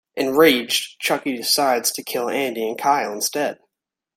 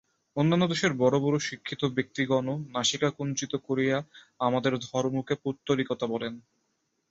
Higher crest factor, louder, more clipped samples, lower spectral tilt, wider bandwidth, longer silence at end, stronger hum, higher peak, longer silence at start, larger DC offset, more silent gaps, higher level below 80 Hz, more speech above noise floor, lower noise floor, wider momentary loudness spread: about the same, 18 dB vs 18 dB; first, -20 LUFS vs -28 LUFS; neither; second, -2 dB/octave vs -5 dB/octave; first, 16.5 kHz vs 8 kHz; about the same, 0.6 s vs 0.7 s; neither; first, -2 dBFS vs -10 dBFS; second, 0.15 s vs 0.35 s; neither; neither; about the same, -66 dBFS vs -66 dBFS; first, 63 dB vs 48 dB; first, -83 dBFS vs -76 dBFS; about the same, 9 LU vs 8 LU